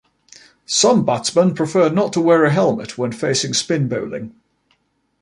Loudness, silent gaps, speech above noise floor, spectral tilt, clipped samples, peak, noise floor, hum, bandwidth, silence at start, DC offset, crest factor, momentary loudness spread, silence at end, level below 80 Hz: -17 LUFS; none; 48 dB; -4.5 dB/octave; under 0.1%; -2 dBFS; -64 dBFS; none; 11.5 kHz; 0.7 s; under 0.1%; 16 dB; 11 LU; 0.9 s; -60 dBFS